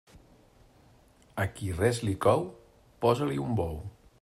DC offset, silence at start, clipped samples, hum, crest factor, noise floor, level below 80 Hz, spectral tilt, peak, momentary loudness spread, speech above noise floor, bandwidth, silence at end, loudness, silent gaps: under 0.1%; 1.35 s; under 0.1%; none; 20 dB; -60 dBFS; -54 dBFS; -6.5 dB/octave; -10 dBFS; 15 LU; 32 dB; 15.5 kHz; 0.3 s; -29 LUFS; none